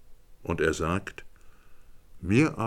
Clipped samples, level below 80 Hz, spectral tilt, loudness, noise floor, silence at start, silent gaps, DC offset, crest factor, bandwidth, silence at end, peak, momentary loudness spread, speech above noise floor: under 0.1%; -50 dBFS; -6 dB/octave; -28 LUFS; -48 dBFS; 0 s; none; under 0.1%; 20 dB; 15 kHz; 0 s; -8 dBFS; 18 LU; 22 dB